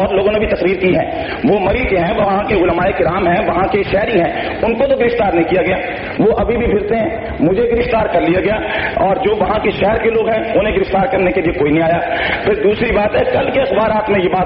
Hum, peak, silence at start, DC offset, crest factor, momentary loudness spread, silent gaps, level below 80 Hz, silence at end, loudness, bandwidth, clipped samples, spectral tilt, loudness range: none; -4 dBFS; 0 s; under 0.1%; 10 dB; 3 LU; none; -32 dBFS; 0 s; -14 LUFS; 5.6 kHz; under 0.1%; -4.5 dB/octave; 1 LU